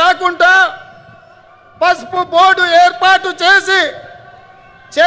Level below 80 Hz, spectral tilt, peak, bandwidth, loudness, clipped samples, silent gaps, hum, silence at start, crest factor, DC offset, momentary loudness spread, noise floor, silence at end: -54 dBFS; -1.5 dB/octave; 0 dBFS; 8 kHz; -10 LUFS; under 0.1%; none; none; 0 s; 12 dB; under 0.1%; 7 LU; -43 dBFS; 0 s